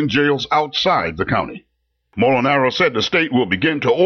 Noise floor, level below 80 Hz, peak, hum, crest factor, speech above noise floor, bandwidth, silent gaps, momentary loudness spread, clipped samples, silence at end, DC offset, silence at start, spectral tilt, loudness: -55 dBFS; -48 dBFS; -6 dBFS; none; 12 dB; 39 dB; 6.8 kHz; none; 5 LU; under 0.1%; 0 s; under 0.1%; 0 s; -5.5 dB/octave; -17 LUFS